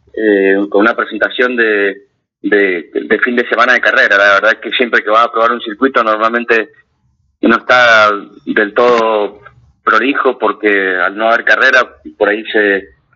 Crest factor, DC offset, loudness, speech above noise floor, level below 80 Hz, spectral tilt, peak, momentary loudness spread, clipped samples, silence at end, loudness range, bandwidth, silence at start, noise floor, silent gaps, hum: 12 dB; under 0.1%; -11 LUFS; 47 dB; -56 dBFS; -4 dB/octave; 0 dBFS; 9 LU; under 0.1%; 0.3 s; 3 LU; 7.4 kHz; 0.15 s; -58 dBFS; none; none